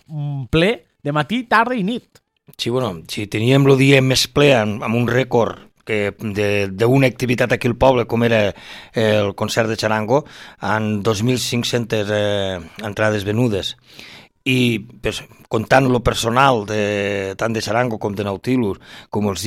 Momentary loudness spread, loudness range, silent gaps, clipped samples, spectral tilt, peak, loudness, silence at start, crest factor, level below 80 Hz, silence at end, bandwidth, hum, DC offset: 12 LU; 4 LU; none; under 0.1%; -5.5 dB/octave; 0 dBFS; -18 LUFS; 0.1 s; 18 dB; -44 dBFS; 0 s; 16 kHz; none; under 0.1%